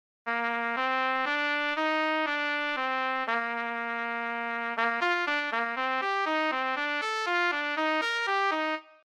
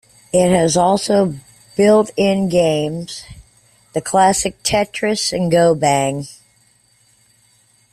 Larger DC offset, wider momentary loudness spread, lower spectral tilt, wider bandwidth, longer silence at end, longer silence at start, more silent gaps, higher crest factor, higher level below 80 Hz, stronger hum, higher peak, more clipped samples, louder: neither; second, 5 LU vs 14 LU; second, -2 dB/octave vs -4.5 dB/octave; about the same, 14.5 kHz vs 14 kHz; second, 0.2 s vs 1.6 s; about the same, 0.25 s vs 0.35 s; neither; about the same, 18 dB vs 16 dB; second, -84 dBFS vs -48 dBFS; neither; second, -12 dBFS vs -2 dBFS; neither; second, -28 LUFS vs -16 LUFS